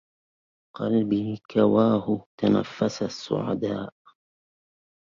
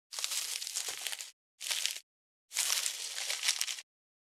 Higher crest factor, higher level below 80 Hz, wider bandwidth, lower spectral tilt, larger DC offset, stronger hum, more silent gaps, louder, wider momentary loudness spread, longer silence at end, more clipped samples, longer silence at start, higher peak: second, 18 dB vs 32 dB; first, -62 dBFS vs under -90 dBFS; second, 7.4 kHz vs over 20 kHz; first, -7 dB/octave vs 5.5 dB/octave; neither; neither; second, 1.45-1.49 s, 2.26-2.38 s vs 1.33-1.58 s, 2.03-2.48 s; first, -25 LUFS vs -34 LUFS; about the same, 10 LU vs 12 LU; first, 1.25 s vs 0.5 s; neither; first, 0.8 s vs 0.1 s; about the same, -8 dBFS vs -6 dBFS